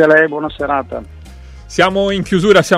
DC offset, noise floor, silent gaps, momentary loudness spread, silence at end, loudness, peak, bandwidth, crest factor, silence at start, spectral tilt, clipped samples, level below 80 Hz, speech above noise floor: under 0.1%; -34 dBFS; none; 12 LU; 0 s; -14 LUFS; 0 dBFS; 15 kHz; 14 dB; 0 s; -5 dB/octave; 0.1%; -38 dBFS; 21 dB